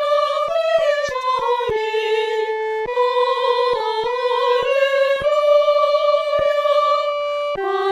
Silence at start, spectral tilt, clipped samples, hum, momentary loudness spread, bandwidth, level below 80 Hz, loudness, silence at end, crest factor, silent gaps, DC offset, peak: 0 s; -3 dB/octave; under 0.1%; none; 6 LU; 11.5 kHz; -54 dBFS; -18 LUFS; 0 s; 12 dB; none; under 0.1%; -6 dBFS